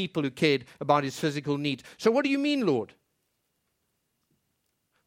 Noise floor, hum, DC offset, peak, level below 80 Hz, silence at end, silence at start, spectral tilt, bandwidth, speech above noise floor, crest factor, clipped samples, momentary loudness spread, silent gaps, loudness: -77 dBFS; none; under 0.1%; -8 dBFS; -72 dBFS; 2.2 s; 0 s; -5.5 dB/octave; 16 kHz; 50 dB; 22 dB; under 0.1%; 5 LU; none; -27 LUFS